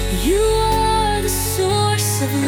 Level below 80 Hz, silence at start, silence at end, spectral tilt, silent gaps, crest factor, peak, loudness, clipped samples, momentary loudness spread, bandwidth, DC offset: -26 dBFS; 0 s; 0 s; -4 dB/octave; none; 14 dB; -4 dBFS; -17 LUFS; under 0.1%; 2 LU; 18 kHz; under 0.1%